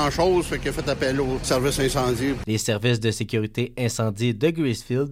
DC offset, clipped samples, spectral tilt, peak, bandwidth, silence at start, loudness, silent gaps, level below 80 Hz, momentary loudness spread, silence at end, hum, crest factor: under 0.1%; under 0.1%; -5 dB/octave; -8 dBFS; 16 kHz; 0 s; -23 LUFS; none; -40 dBFS; 5 LU; 0 s; none; 14 dB